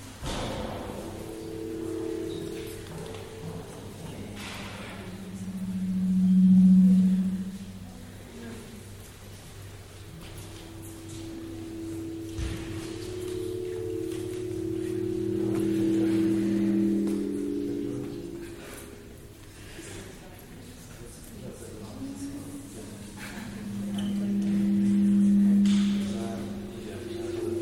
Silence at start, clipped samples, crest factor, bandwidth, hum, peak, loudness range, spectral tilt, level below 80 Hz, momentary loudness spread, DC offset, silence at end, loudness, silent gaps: 0 s; under 0.1%; 16 dB; 15 kHz; none; -12 dBFS; 18 LU; -7 dB/octave; -50 dBFS; 22 LU; under 0.1%; 0 s; -28 LUFS; none